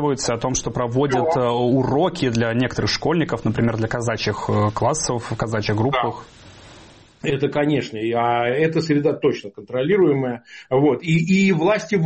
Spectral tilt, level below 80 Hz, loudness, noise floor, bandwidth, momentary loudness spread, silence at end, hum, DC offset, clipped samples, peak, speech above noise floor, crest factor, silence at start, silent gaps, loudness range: -5.5 dB/octave; -46 dBFS; -20 LUFS; -46 dBFS; 8.8 kHz; 7 LU; 0 s; none; 0.1%; under 0.1%; -8 dBFS; 27 dB; 12 dB; 0 s; none; 4 LU